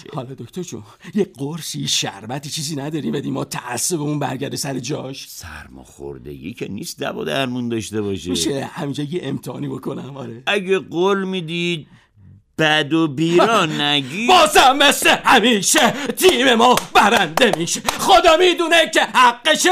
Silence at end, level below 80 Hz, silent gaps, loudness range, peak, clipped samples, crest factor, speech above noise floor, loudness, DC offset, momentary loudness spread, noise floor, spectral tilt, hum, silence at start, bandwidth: 0 s; -50 dBFS; none; 12 LU; -2 dBFS; under 0.1%; 16 dB; 30 dB; -16 LUFS; under 0.1%; 18 LU; -47 dBFS; -3 dB/octave; none; 0.1 s; 16 kHz